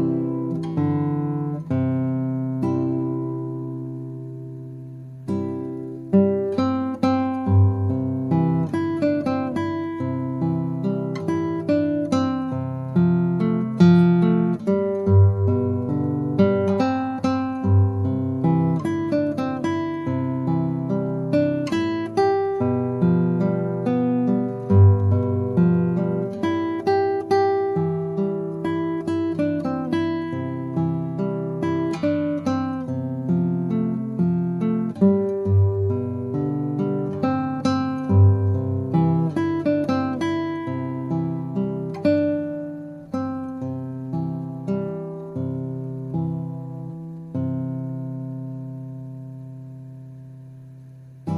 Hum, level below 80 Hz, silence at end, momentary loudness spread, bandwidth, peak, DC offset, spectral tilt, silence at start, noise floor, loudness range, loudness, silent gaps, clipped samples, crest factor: none; -60 dBFS; 0 s; 13 LU; 7 kHz; -4 dBFS; under 0.1%; -9.5 dB/octave; 0 s; -42 dBFS; 9 LU; -22 LUFS; none; under 0.1%; 18 dB